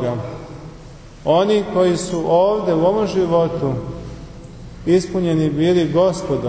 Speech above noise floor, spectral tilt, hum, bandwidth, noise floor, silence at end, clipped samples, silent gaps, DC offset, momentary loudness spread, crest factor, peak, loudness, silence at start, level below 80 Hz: 21 dB; -6.5 dB/octave; none; 8 kHz; -38 dBFS; 0 s; under 0.1%; none; under 0.1%; 20 LU; 14 dB; -4 dBFS; -17 LUFS; 0 s; -42 dBFS